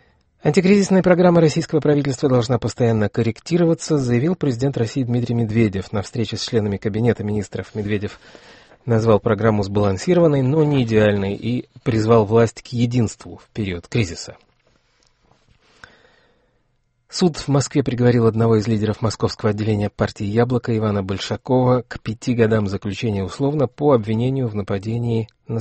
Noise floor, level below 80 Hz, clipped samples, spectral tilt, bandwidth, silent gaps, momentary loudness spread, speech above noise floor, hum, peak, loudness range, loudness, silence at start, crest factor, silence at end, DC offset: -65 dBFS; -48 dBFS; under 0.1%; -7 dB/octave; 8.8 kHz; none; 10 LU; 47 dB; none; -2 dBFS; 8 LU; -19 LUFS; 0.45 s; 18 dB; 0 s; under 0.1%